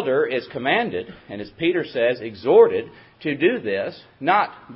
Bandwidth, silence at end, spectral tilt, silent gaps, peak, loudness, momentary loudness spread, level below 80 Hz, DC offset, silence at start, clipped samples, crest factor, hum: 5.8 kHz; 0 s; -10 dB/octave; none; -2 dBFS; -21 LUFS; 16 LU; -60 dBFS; under 0.1%; 0 s; under 0.1%; 18 dB; none